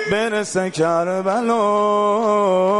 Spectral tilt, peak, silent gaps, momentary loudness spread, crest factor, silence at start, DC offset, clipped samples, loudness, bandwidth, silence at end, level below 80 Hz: -5 dB/octave; -8 dBFS; none; 4 LU; 10 dB; 0 s; under 0.1%; under 0.1%; -18 LUFS; 11.5 kHz; 0 s; -60 dBFS